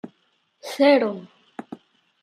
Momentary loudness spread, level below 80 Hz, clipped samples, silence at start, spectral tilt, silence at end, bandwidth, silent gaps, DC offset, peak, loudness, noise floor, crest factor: 26 LU; -80 dBFS; under 0.1%; 0.05 s; -5 dB/octave; 0.45 s; 14 kHz; none; under 0.1%; -6 dBFS; -19 LUFS; -67 dBFS; 20 dB